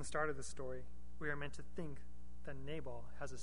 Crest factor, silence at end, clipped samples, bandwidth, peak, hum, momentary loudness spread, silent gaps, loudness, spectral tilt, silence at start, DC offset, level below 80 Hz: 20 dB; 0 s; under 0.1%; 10.5 kHz; -24 dBFS; none; 14 LU; none; -47 LUFS; -4.5 dB/octave; 0 s; 1%; -58 dBFS